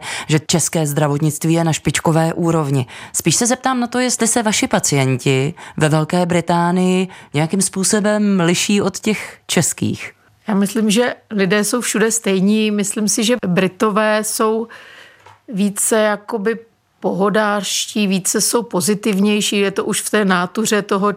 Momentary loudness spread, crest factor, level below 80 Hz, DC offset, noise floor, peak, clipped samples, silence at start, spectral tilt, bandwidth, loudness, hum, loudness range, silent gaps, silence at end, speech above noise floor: 6 LU; 14 dB; -56 dBFS; under 0.1%; -44 dBFS; -2 dBFS; under 0.1%; 0 s; -4 dB/octave; 16 kHz; -16 LUFS; none; 2 LU; none; 0 s; 28 dB